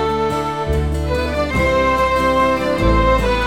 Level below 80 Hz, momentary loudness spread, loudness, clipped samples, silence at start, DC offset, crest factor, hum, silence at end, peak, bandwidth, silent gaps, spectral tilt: -24 dBFS; 5 LU; -17 LUFS; under 0.1%; 0 s; 0.6%; 12 dB; none; 0 s; -4 dBFS; 16.5 kHz; none; -6 dB/octave